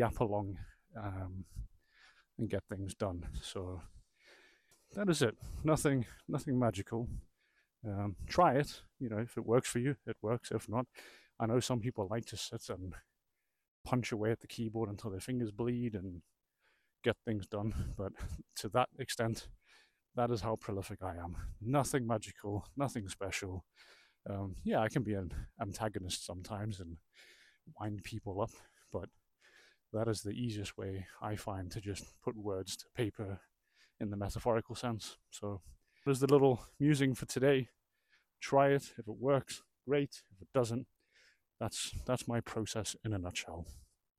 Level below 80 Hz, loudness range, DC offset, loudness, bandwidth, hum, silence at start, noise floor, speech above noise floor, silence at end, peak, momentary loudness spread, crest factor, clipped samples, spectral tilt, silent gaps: -56 dBFS; 9 LU; under 0.1%; -37 LUFS; 15.5 kHz; none; 0 s; -86 dBFS; 49 dB; 0.4 s; -16 dBFS; 15 LU; 22 dB; under 0.1%; -5.5 dB/octave; 13.68-13.84 s